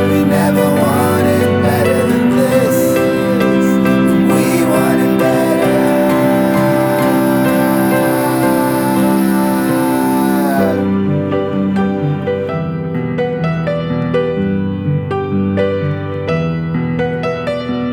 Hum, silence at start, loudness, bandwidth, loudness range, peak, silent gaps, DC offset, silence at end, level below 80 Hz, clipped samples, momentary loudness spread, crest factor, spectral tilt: none; 0 s; -14 LUFS; over 20 kHz; 5 LU; 0 dBFS; none; under 0.1%; 0 s; -44 dBFS; under 0.1%; 6 LU; 12 dB; -6.5 dB/octave